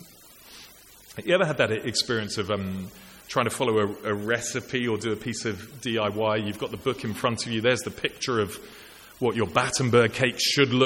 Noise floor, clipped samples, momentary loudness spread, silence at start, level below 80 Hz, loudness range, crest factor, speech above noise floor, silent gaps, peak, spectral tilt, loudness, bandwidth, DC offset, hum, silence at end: -50 dBFS; under 0.1%; 19 LU; 0 s; -58 dBFS; 3 LU; 22 dB; 25 dB; none; -4 dBFS; -4 dB/octave; -26 LUFS; 17 kHz; under 0.1%; none; 0 s